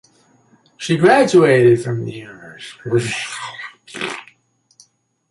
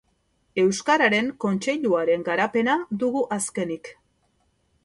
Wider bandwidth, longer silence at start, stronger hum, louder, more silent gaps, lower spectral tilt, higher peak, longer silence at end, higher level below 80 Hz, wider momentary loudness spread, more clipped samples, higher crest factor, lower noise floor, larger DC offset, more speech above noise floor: about the same, 11.5 kHz vs 12 kHz; first, 0.8 s vs 0.55 s; neither; first, -16 LUFS vs -23 LUFS; neither; about the same, -5.5 dB/octave vs -4.5 dB/octave; first, -2 dBFS vs -6 dBFS; first, 1.1 s vs 0.9 s; first, -60 dBFS vs -66 dBFS; first, 22 LU vs 11 LU; neither; about the same, 16 dB vs 18 dB; second, -59 dBFS vs -68 dBFS; neither; about the same, 43 dB vs 45 dB